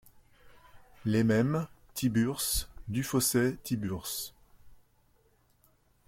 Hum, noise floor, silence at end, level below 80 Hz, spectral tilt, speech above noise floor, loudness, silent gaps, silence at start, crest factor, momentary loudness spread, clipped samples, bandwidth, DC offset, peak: none; -67 dBFS; 1.35 s; -52 dBFS; -4.5 dB/octave; 38 dB; -30 LUFS; none; 0.05 s; 18 dB; 11 LU; under 0.1%; 16.5 kHz; under 0.1%; -16 dBFS